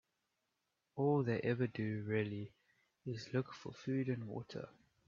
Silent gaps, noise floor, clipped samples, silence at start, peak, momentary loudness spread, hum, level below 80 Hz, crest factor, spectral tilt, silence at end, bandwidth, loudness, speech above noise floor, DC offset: none; -86 dBFS; under 0.1%; 0.95 s; -22 dBFS; 15 LU; none; -76 dBFS; 18 dB; -7 dB/octave; 0.4 s; 7.4 kHz; -40 LUFS; 47 dB; under 0.1%